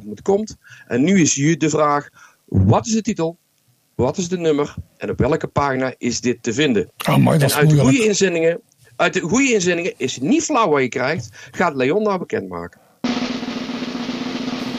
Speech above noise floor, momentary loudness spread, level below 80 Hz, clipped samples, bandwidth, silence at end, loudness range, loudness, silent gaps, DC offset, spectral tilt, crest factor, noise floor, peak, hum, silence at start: 43 dB; 11 LU; -48 dBFS; under 0.1%; 15.5 kHz; 0 s; 5 LU; -18 LUFS; none; under 0.1%; -5 dB/octave; 14 dB; -61 dBFS; -4 dBFS; none; 0 s